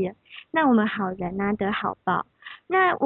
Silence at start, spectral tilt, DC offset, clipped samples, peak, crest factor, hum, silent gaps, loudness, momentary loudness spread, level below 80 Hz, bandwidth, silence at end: 0 s; -10.5 dB/octave; under 0.1%; under 0.1%; -10 dBFS; 16 dB; none; none; -24 LUFS; 14 LU; -56 dBFS; 4.2 kHz; 0 s